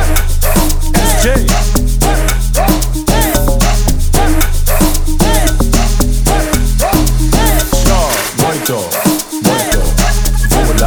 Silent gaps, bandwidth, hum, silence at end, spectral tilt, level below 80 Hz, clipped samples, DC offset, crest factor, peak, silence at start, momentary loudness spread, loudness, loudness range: none; over 20 kHz; none; 0 s; -4 dB/octave; -12 dBFS; under 0.1%; under 0.1%; 10 dB; 0 dBFS; 0 s; 2 LU; -12 LUFS; 0 LU